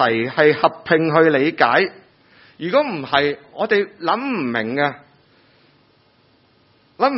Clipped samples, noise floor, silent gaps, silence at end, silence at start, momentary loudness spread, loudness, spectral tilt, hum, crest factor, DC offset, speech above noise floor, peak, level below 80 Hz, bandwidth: under 0.1%; -57 dBFS; none; 0 s; 0 s; 7 LU; -18 LUFS; -9 dB/octave; none; 20 dB; under 0.1%; 39 dB; 0 dBFS; -62 dBFS; 5.8 kHz